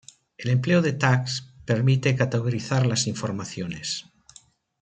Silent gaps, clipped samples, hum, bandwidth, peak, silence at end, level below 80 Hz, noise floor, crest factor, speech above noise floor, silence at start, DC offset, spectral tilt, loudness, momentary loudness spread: none; under 0.1%; none; 9 kHz; -6 dBFS; 0.8 s; -60 dBFS; -55 dBFS; 18 dB; 32 dB; 0.4 s; under 0.1%; -5.5 dB/octave; -24 LUFS; 11 LU